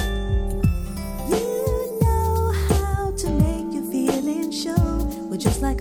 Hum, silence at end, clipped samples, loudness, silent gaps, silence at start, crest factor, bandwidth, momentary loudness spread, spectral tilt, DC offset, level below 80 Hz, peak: none; 0 s; under 0.1%; -23 LUFS; none; 0 s; 18 dB; 19 kHz; 5 LU; -6.5 dB/octave; under 0.1%; -26 dBFS; -4 dBFS